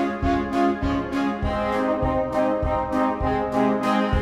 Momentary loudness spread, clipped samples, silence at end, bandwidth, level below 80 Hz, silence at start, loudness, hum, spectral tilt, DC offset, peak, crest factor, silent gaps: 3 LU; under 0.1%; 0 s; 12.5 kHz; -34 dBFS; 0 s; -23 LUFS; none; -7.5 dB/octave; under 0.1%; -8 dBFS; 14 dB; none